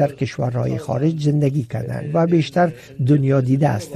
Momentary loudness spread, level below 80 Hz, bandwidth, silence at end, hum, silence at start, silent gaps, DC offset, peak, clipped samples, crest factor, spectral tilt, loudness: 7 LU; -52 dBFS; 12.5 kHz; 0 s; none; 0 s; none; under 0.1%; -6 dBFS; under 0.1%; 12 dB; -8 dB/octave; -19 LUFS